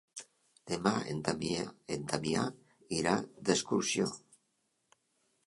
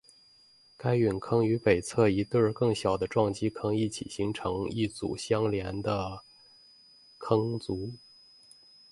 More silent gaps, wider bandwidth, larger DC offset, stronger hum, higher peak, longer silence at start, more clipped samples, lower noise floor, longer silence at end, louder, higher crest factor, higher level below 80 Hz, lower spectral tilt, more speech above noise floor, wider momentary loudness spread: neither; about the same, 11.5 kHz vs 11.5 kHz; neither; neither; about the same, -12 dBFS vs -10 dBFS; second, 0.15 s vs 0.8 s; neither; first, -79 dBFS vs -60 dBFS; first, 1.3 s vs 0.95 s; second, -34 LUFS vs -29 LUFS; about the same, 24 dB vs 20 dB; second, -66 dBFS vs -54 dBFS; second, -4 dB/octave vs -6.5 dB/octave; first, 45 dB vs 32 dB; about the same, 9 LU vs 10 LU